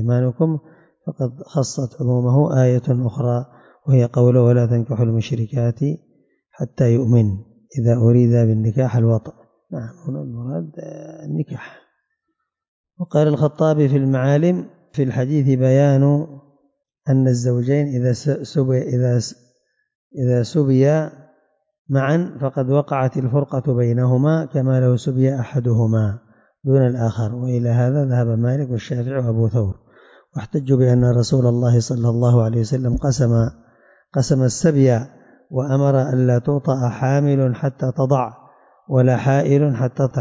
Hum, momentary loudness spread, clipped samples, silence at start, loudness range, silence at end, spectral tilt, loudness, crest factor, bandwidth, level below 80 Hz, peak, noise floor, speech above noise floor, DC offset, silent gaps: none; 13 LU; under 0.1%; 0 s; 3 LU; 0 s; -8 dB/octave; -18 LUFS; 14 dB; 7.8 kHz; -46 dBFS; -4 dBFS; -76 dBFS; 59 dB; under 0.1%; 12.68-12.84 s, 19.95-20.11 s, 21.79-21.85 s